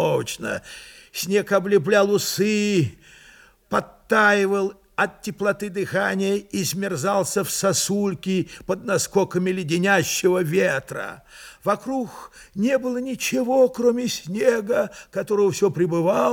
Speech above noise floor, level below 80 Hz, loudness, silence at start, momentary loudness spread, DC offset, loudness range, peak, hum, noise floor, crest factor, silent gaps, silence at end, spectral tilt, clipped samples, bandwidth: 29 dB; -58 dBFS; -22 LUFS; 0 s; 10 LU; under 0.1%; 2 LU; -4 dBFS; none; -51 dBFS; 18 dB; none; 0 s; -4.5 dB/octave; under 0.1%; 18.5 kHz